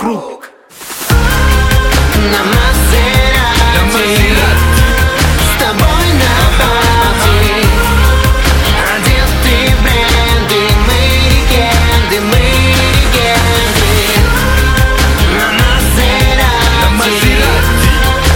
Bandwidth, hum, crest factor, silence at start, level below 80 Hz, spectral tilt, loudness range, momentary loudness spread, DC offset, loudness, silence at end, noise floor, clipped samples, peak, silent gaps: 17.5 kHz; none; 8 dB; 0 s; -12 dBFS; -4 dB/octave; 0 LU; 1 LU; under 0.1%; -9 LUFS; 0 s; -32 dBFS; under 0.1%; 0 dBFS; none